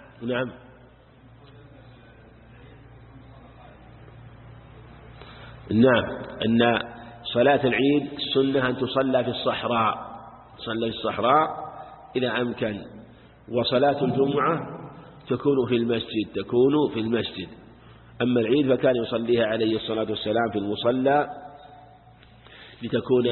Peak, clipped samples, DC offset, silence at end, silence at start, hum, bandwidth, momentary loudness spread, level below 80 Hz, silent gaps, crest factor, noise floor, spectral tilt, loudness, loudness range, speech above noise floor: -6 dBFS; under 0.1%; under 0.1%; 0 s; 0.2 s; none; 4.3 kHz; 18 LU; -54 dBFS; none; 20 dB; -52 dBFS; -10.5 dB/octave; -24 LUFS; 4 LU; 29 dB